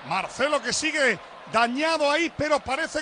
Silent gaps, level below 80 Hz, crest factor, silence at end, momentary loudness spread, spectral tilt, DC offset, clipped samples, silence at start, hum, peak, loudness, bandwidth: none; -56 dBFS; 16 dB; 0 s; 5 LU; -2.5 dB/octave; under 0.1%; under 0.1%; 0 s; none; -8 dBFS; -24 LUFS; 10 kHz